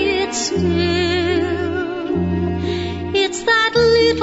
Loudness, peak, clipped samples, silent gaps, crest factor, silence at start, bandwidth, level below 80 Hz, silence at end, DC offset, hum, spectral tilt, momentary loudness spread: -18 LUFS; -4 dBFS; under 0.1%; none; 14 dB; 0 s; 8 kHz; -38 dBFS; 0 s; under 0.1%; none; -4.5 dB/octave; 8 LU